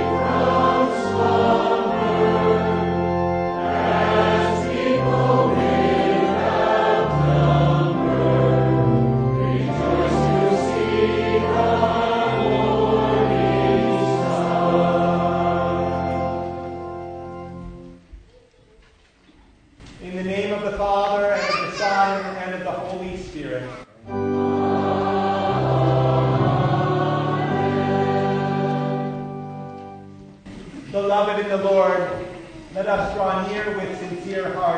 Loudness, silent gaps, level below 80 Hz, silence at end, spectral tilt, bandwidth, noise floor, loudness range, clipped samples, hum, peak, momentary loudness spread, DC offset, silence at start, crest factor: -20 LUFS; none; -42 dBFS; 0 s; -7.5 dB/octave; 9.4 kHz; -54 dBFS; 7 LU; under 0.1%; none; -4 dBFS; 14 LU; under 0.1%; 0 s; 16 dB